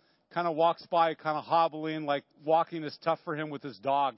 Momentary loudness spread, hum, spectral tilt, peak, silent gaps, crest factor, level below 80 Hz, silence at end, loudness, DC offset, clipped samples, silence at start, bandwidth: 9 LU; none; -9.5 dB/octave; -14 dBFS; none; 16 dB; -84 dBFS; 0.05 s; -30 LUFS; under 0.1%; under 0.1%; 0.35 s; 5.8 kHz